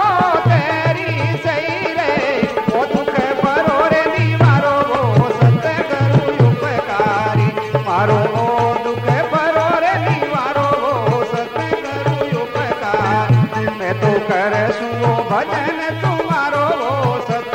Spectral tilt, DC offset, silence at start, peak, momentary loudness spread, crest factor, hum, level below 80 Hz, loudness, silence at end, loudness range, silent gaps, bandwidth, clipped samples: -7 dB/octave; under 0.1%; 0 s; 0 dBFS; 5 LU; 14 dB; none; -48 dBFS; -16 LUFS; 0 s; 3 LU; none; 9.2 kHz; under 0.1%